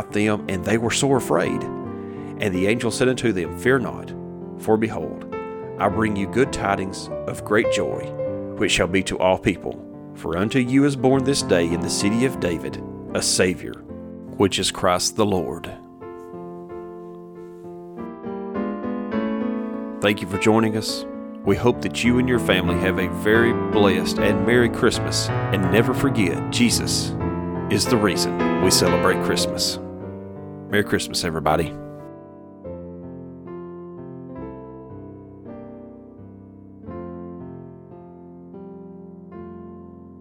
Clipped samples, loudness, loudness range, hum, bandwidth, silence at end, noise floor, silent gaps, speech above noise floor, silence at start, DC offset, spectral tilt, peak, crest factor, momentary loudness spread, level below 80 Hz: under 0.1%; -21 LUFS; 19 LU; none; 19 kHz; 0 s; -42 dBFS; none; 22 dB; 0 s; under 0.1%; -4.5 dB/octave; -2 dBFS; 20 dB; 21 LU; -46 dBFS